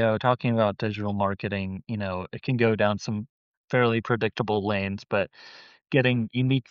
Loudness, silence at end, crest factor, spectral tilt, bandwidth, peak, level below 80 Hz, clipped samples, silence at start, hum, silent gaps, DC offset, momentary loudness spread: -26 LUFS; 0.1 s; 18 dB; -5.5 dB/octave; 7 kHz; -8 dBFS; -62 dBFS; under 0.1%; 0 s; none; 3.29-3.68 s; under 0.1%; 9 LU